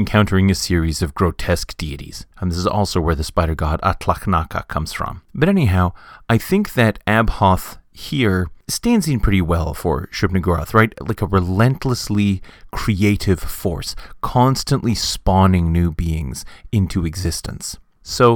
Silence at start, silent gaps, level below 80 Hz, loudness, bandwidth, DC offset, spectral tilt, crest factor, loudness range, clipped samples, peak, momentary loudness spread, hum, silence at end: 0 s; none; -30 dBFS; -19 LUFS; 19 kHz; under 0.1%; -6 dB/octave; 18 dB; 3 LU; under 0.1%; 0 dBFS; 11 LU; none; 0 s